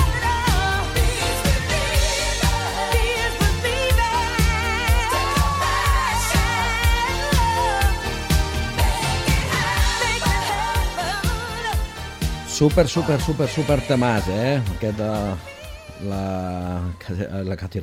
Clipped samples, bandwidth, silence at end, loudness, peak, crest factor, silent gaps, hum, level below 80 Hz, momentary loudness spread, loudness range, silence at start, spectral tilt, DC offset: under 0.1%; 16.5 kHz; 0 s; -21 LUFS; -4 dBFS; 18 dB; none; none; -26 dBFS; 8 LU; 3 LU; 0 s; -4.5 dB/octave; under 0.1%